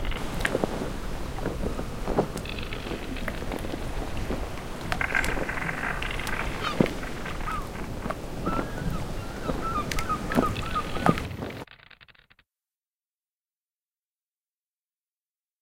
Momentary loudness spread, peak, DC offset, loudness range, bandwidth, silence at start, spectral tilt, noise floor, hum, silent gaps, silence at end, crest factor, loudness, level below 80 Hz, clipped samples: 9 LU; -4 dBFS; under 0.1%; 4 LU; 17 kHz; 0 s; -5 dB/octave; under -90 dBFS; none; none; 3.5 s; 26 dB; -30 LUFS; -36 dBFS; under 0.1%